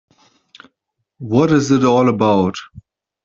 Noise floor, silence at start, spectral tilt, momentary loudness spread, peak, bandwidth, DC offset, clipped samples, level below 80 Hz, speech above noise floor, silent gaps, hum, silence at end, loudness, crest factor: -74 dBFS; 1.2 s; -6.5 dB/octave; 13 LU; -2 dBFS; 7.6 kHz; under 0.1%; under 0.1%; -54 dBFS; 60 dB; none; none; 0.45 s; -15 LUFS; 16 dB